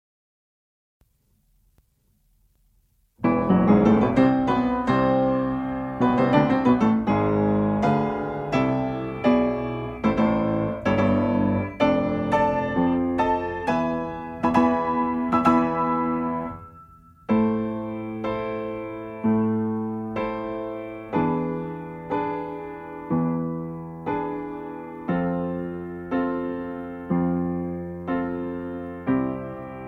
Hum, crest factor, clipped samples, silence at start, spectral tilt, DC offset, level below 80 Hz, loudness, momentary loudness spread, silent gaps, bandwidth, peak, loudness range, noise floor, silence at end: none; 20 dB; under 0.1%; 3.2 s; -8.5 dB/octave; under 0.1%; -48 dBFS; -24 LUFS; 13 LU; none; 7.4 kHz; -4 dBFS; 8 LU; -65 dBFS; 0 s